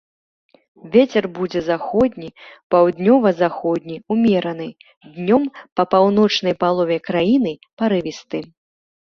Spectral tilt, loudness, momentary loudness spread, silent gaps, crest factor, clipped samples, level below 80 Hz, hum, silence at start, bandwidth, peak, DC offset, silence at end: -6.5 dB/octave; -18 LUFS; 12 LU; 2.63-2.70 s, 4.97-5.01 s, 5.72-5.76 s, 7.73-7.77 s; 16 dB; under 0.1%; -56 dBFS; none; 0.85 s; 6.8 kHz; -2 dBFS; under 0.1%; 0.55 s